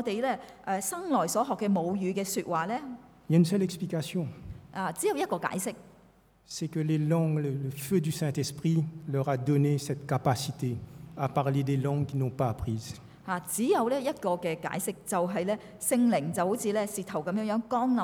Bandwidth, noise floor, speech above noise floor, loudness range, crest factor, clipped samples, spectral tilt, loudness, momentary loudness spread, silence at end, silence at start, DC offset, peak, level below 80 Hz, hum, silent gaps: over 20 kHz; -60 dBFS; 31 dB; 2 LU; 18 dB; under 0.1%; -6 dB/octave; -30 LUFS; 9 LU; 0 s; 0 s; under 0.1%; -12 dBFS; -60 dBFS; none; none